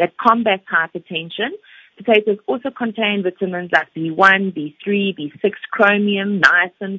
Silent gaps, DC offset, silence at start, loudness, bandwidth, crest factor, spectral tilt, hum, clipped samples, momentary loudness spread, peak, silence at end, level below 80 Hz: none; under 0.1%; 0 s; -17 LUFS; 8 kHz; 18 dB; -6 dB/octave; none; under 0.1%; 12 LU; 0 dBFS; 0 s; -64 dBFS